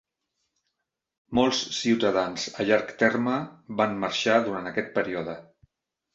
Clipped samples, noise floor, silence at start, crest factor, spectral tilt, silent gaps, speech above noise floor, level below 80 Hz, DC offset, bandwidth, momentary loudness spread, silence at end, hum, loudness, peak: under 0.1%; -82 dBFS; 1.3 s; 20 dB; -4 dB/octave; none; 57 dB; -62 dBFS; under 0.1%; 8 kHz; 8 LU; 0.7 s; none; -26 LUFS; -6 dBFS